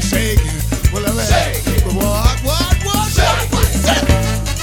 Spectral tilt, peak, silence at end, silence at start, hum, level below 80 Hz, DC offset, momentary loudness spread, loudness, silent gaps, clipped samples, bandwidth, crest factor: -4.5 dB/octave; 0 dBFS; 0 s; 0 s; none; -18 dBFS; under 0.1%; 3 LU; -15 LUFS; none; under 0.1%; 18 kHz; 14 dB